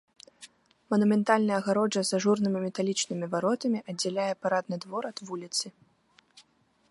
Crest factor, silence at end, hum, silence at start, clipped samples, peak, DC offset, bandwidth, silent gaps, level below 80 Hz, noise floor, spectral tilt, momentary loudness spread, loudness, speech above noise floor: 22 dB; 0.5 s; none; 0.4 s; under 0.1%; -8 dBFS; under 0.1%; 11.5 kHz; none; -76 dBFS; -66 dBFS; -4.5 dB/octave; 11 LU; -28 LUFS; 38 dB